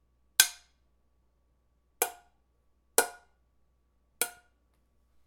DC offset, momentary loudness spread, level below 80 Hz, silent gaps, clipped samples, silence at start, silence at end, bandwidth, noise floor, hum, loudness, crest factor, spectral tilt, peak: under 0.1%; 10 LU; -72 dBFS; none; under 0.1%; 0.4 s; 0.95 s; 19 kHz; -71 dBFS; none; -29 LUFS; 34 dB; 1.5 dB/octave; -2 dBFS